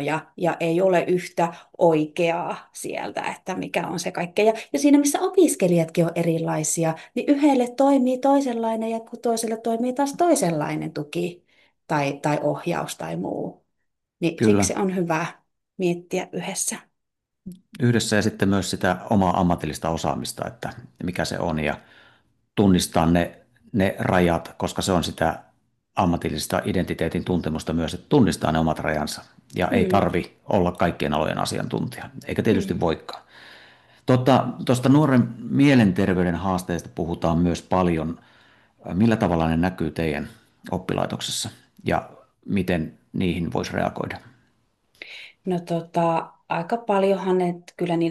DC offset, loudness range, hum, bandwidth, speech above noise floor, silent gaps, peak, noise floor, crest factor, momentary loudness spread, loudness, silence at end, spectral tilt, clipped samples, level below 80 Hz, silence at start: under 0.1%; 7 LU; none; 12.5 kHz; 59 dB; none; -4 dBFS; -81 dBFS; 20 dB; 12 LU; -23 LUFS; 0 s; -5.5 dB/octave; under 0.1%; -52 dBFS; 0 s